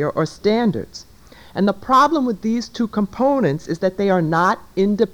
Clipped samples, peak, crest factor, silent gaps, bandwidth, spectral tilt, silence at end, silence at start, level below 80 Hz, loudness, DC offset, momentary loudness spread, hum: under 0.1%; -4 dBFS; 14 dB; none; 19 kHz; -6.5 dB/octave; 0 s; 0 s; -50 dBFS; -19 LUFS; under 0.1%; 8 LU; none